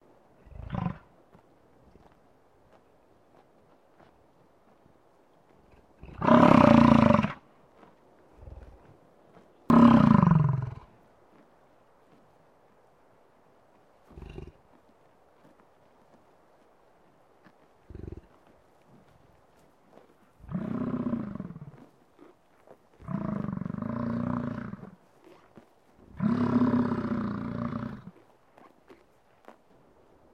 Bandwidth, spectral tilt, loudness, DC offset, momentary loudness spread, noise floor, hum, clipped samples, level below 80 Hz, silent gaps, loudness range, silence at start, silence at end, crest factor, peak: 7.4 kHz; -8.5 dB/octave; -25 LUFS; under 0.1%; 29 LU; -62 dBFS; none; under 0.1%; -52 dBFS; none; 16 LU; 0.6 s; 2.25 s; 24 dB; -6 dBFS